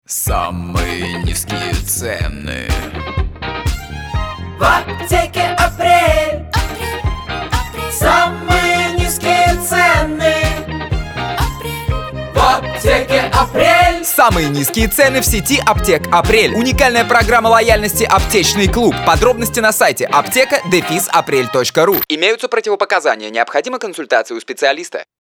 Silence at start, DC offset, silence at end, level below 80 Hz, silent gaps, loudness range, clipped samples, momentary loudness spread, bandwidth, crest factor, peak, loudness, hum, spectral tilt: 0.1 s; under 0.1%; 0.2 s; -26 dBFS; none; 7 LU; under 0.1%; 11 LU; over 20 kHz; 14 dB; 0 dBFS; -14 LUFS; none; -3.5 dB/octave